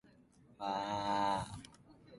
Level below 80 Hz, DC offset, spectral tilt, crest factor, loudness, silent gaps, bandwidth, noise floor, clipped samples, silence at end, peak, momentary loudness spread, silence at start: -64 dBFS; under 0.1%; -4.5 dB/octave; 18 dB; -38 LUFS; none; 11.5 kHz; -65 dBFS; under 0.1%; 0 s; -22 dBFS; 16 LU; 0.6 s